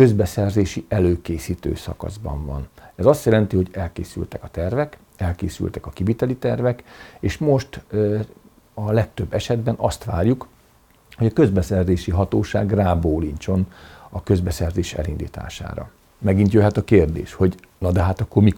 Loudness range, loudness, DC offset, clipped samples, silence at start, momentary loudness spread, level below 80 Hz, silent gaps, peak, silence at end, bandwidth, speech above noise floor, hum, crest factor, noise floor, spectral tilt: 4 LU; -21 LUFS; under 0.1%; under 0.1%; 0 s; 13 LU; -38 dBFS; none; -2 dBFS; 0 s; 18 kHz; 35 dB; none; 18 dB; -54 dBFS; -7.5 dB/octave